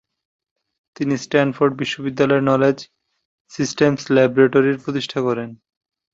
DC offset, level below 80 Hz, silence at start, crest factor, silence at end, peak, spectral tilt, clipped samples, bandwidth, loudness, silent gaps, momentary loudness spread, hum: under 0.1%; -60 dBFS; 1 s; 18 dB; 0.6 s; -2 dBFS; -6 dB/octave; under 0.1%; 7.8 kHz; -18 LUFS; 3.25-3.45 s; 11 LU; none